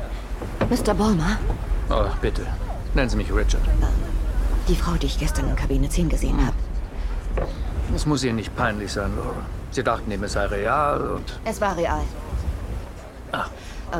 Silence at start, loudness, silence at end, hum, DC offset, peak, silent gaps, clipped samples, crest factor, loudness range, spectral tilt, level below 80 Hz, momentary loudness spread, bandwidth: 0 s; -25 LUFS; 0 s; none; under 0.1%; -4 dBFS; none; under 0.1%; 18 dB; 2 LU; -6 dB/octave; -26 dBFS; 10 LU; 14 kHz